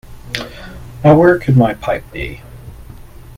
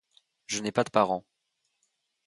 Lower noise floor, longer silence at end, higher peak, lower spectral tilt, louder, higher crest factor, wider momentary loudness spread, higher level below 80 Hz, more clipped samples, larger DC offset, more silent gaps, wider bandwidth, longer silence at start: second, -35 dBFS vs -79 dBFS; second, 0.55 s vs 1.05 s; first, 0 dBFS vs -6 dBFS; first, -8 dB/octave vs -4 dB/octave; first, -13 LUFS vs -28 LUFS; second, 16 dB vs 24 dB; first, 23 LU vs 9 LU; first, -36 dBFS vs -72 dBFS; neither; neither; neither; first, 15.5 kHz vs 11.5 kHz; second, 0.1 s vs 0.5 s